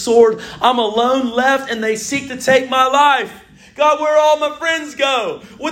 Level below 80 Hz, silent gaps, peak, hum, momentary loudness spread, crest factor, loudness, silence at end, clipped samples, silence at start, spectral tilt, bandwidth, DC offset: -54 dBFS; none; 0 dBFS; none; 7 LU; 16 dB; -15 LUFS; 0 s; under 0.1%; 0 s; -2.5 dB/octave; 16.5 kHz; under 0.1%